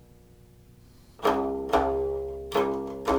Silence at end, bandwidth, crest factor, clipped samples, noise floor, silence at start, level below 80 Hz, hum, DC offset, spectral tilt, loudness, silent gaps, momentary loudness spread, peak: 0 s; over 20 kHz; 20 dB; under 0.1%; -53 dBFS; 1.1 s; -46 dBFS; 60 Hz at -65 dBFS; under 0.1%; -5.5 dB/octave; -28 LUFS; none; 6 LU; -8 dBFS